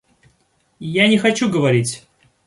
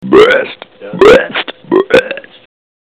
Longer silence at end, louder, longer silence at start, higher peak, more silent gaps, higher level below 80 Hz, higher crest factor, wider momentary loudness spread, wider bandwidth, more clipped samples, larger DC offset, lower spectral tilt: second, 0.5 s vs 0.65 s; second, -17 LUFS vs -9 LUFS; first, 0.8 s vs 0 s; about the same, -2 dBFS vs 0 dBFS; neither; second, -58 dBFS vs -40 dBFS; first, 18 dB vs 10 dB; about the same, 16 LU vs 18 LU; about the same, 11.5 kHz vs 11.5 kHz; second, under 0.1% vs 3%; second, under 0.1% vs 0.3%; about the same, -5 dB/octave vs -5 dB/octave